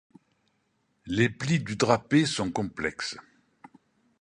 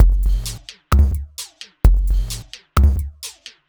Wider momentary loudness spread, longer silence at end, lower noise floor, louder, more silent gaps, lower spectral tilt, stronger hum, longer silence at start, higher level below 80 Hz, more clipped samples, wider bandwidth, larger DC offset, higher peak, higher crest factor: second, 11 LU vs 16 LU; first, 1 s vs 0.4 s; first, -73 dBFS vs -37 dBFS; second, -27 LUFS vs -20 LUFS; neither; about the same, -5 dB/octave vs -5.5 dB/octave; neither; first, 1.05 s vs 0 s; second, -58 dBFS vs -18 dBFS; neither; second, 11 kHz vs over 20 kHz; neither; second, -6 dBFS vs 0 dBFS; first, 24 dB vs 16 dB